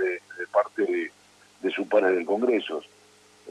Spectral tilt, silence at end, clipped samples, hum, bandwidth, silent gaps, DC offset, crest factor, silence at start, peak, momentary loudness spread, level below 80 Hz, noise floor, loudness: -5 dB/octave; 0 s; under 0.1%; 50 Hz at -65 dBFS; 10.5 kHz; none; under 0.1%; 18 dB; 0 s; -8 dBFS; 12 LU; -82 dBFS; -57 dBFS; -26 LUFS